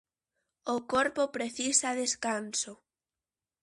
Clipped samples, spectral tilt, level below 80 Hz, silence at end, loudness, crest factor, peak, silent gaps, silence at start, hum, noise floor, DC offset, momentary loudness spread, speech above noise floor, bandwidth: under 0.1%; -1 dB/octave; -70 dBFS; 0.85 s; -30 LUFS; 22 dB; -12 dBFS; none; 0.65 s; none; under -90 dBFS; under 0.1%; 8 LU; over 59 dB; 11.5 kHz